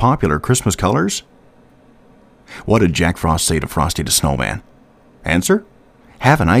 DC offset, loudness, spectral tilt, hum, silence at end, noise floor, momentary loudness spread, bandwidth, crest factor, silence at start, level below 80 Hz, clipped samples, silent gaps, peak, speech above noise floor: under 0.1%; -16 LUFS; -4.5 dB/octave; none; 0 s; -48 dBFS; 9 LU; 16 kHz; 18 dB; 0 s; -34 dBFS; under 0.1%; none; 0 dBFS; 32 dB